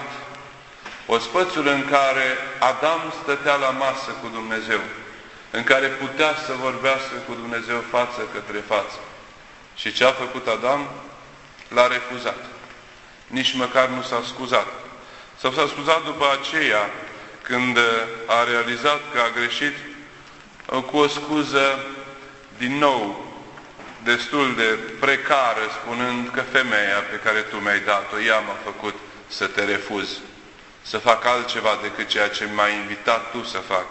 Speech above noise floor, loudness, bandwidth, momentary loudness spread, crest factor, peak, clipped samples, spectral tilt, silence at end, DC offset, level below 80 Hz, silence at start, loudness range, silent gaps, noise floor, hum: 24 dB; -21 LUFS; 8.4 kHz; 19 LU; 22 dB; 0 dBFS; under 0.1%; -3 dB/octave; 0 s; under 0.1%; -58 dBFS; 0 s; 4 LU; none; -45 dBFS; none